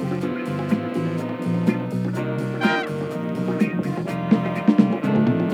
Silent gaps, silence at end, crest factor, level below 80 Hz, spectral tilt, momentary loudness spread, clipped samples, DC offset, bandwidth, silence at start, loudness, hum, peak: none; 0 s; 20 dB; -66 dBFS; -8 dB/octave; 7 LU; under 0.1%; under 0.1%; 13.5 kHz; 0 s; -23 LUFS; none; -2 dBFS